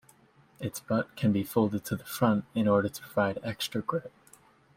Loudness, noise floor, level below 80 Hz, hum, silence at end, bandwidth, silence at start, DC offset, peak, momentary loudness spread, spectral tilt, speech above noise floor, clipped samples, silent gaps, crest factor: -30 LUFS; -61 dBFS; -64 dBFS; none; 0.7 s; 16.5 kHz; 0.6 s; under 0.1%; -10 dBFS; 10 LU; -6 dB/octave; 32 dB; under 0.1%; none; 20 dB